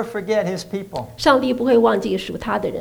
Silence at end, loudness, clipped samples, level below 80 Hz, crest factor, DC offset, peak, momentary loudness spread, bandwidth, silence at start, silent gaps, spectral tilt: 0 s; -19 LUFS; under 0.1%; -48 dBFS; 18 dB; under 0.1%; -2 dBFS; 12 LU; over 20 kHz; 0 s; none; -5.5 dB/octave